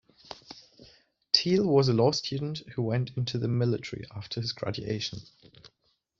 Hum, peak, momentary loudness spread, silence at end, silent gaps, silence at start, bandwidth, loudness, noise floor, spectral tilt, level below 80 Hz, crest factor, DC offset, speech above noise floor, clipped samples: none; -4 dBFS; 22 LU; 0.55 s; none; 0.3 s; 7.6 kHz; -28 LUFS; -74 dBFS; -5.5 dB/octave; -62 dBFS; 24 dB; under 0.1%; 46 dB; under 0.1%